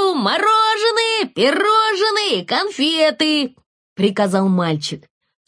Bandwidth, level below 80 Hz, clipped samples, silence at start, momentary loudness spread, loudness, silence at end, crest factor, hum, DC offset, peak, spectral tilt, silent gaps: 10.5 kHz; -68 dBFS; under 0.1%; 0 s; 7 LU; -16 LUFS; 0.5 s; 14 dB; none; under 0.1%; -2 dBFS; -4.5 dB/octave; 3.66-3.96 s